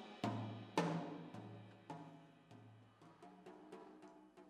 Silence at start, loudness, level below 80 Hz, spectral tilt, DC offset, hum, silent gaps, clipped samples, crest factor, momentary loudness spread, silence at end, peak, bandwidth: 0 s; -47 LUFS; -88 dBFS; -6 dB/octave; under 0.1%; none; none; under 0.1%; 28 dB; 21 LU; 0 s; -20 dBFS; 12.5 kHz